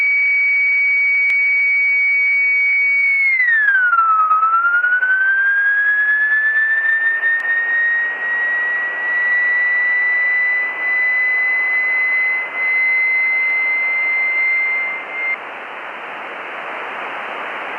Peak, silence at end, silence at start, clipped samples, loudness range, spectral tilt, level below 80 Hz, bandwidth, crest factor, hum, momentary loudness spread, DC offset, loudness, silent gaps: -6 dBFS; 0 s; 0 s; under 0.1%; 5 LU; -2 dB/octave; -86 dBFS; 5.6 kHz; 12 dB; none; 13 LU; under 0.1%; -14 LUFS; none